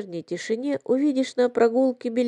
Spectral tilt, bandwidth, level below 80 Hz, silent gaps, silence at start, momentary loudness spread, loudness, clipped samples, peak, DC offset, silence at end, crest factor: -5.5 dB/octave; 10.5 kHz; -82 dBFS; none; 0 s; 9 LU; -23 LUFS; under 0.1%; -8 dBFS; under 0.1%; 0 s; 16 dB